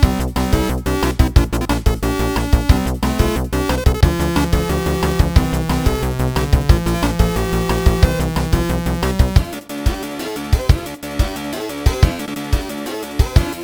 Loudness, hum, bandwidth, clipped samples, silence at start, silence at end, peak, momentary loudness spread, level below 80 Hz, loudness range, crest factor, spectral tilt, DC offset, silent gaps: -18 LUFS; none; over 20 kHz; 0.3%; 0 s; 0 s; 0 dBFS; 7 LU; -20 dBFS; 3 LU; 16 dB; -6 dB/octave; under 0.1%; none